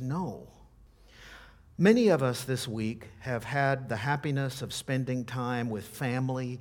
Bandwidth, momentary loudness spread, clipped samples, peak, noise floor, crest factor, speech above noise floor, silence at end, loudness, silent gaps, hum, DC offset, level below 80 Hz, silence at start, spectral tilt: 18 kHz; 16 LU; under 0.1%; -8 dBFS; -57 dBFS; 22 dB; 27 dB; 0 s; -30 LUFS; none; none; under 0.1%; -60 dBFS; 0 s; -6 dB/octave